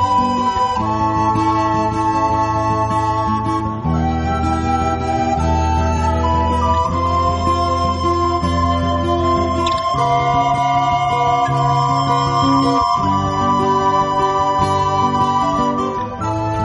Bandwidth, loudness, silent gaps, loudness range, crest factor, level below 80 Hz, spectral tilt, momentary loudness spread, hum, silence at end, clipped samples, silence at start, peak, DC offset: 11.5 kHz; -16 LUFS; none; 2 LU; 12 dB; -30 dBFS; -6.5 dB/octave; 3 LU; none; 0 s; under 0.1%; 0 s; -4 dBFS; under 0.1%